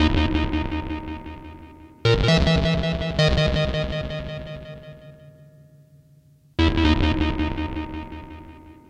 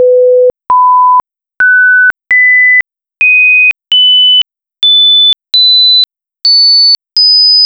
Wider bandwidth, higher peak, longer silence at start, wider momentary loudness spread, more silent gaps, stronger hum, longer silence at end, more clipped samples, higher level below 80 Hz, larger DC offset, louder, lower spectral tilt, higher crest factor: first, 9.6 kHz vs 8 kHz; about the same, -4 dBFS vs -2 dBFS; about the same, 0 s vs 0 s; first, 21 LU vs 7 LU; neither; neither; first, 0.15 s vs 0 s; neither; first, -30 dBFS vs -56 dBFS; neither; second, -23 LUFS vs -4 LUFS; first, -6.5 dB/octave vs 0 dB/octave; first, 18 dB vs 4 dB